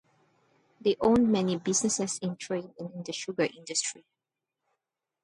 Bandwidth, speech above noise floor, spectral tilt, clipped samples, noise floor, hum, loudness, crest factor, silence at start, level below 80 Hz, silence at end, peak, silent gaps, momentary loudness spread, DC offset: 11.5 kHz; 59 dB; -4 dB/octave; under 0.1%; -88 dBFS; none; -29 LUFS; 18 dB; 0.85 s; -62 dBFS; 1.25 s; -12 dBFS; none; 13 LU; under 0.1%